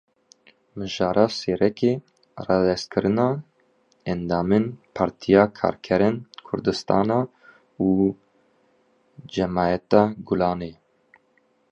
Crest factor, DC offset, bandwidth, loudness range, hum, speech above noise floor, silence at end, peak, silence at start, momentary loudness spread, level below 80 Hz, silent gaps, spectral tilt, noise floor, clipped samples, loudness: 22 dB; under 0.1%; 8.8 kHz; 3 LU; none; 43 dB; 1 s; -2 dBFS; 0.75 s; 13 LU; -52 dBFS; none; -7 dB/octave; -65 dBFS; under 0.1%; -23 LUFS